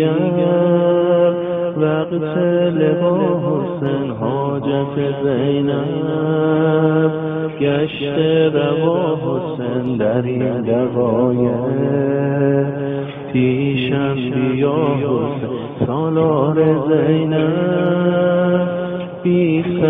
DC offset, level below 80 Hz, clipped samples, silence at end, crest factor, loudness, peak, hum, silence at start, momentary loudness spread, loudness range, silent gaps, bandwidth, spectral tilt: under 0.1%; -54 dBFS; under 0.1%; 0 s; 12 dB; -17 LUFS; -4 dBFS; none; 0 s; 6 LU; 2 LU; none; 3.9 kHz; -11.5 dB/octave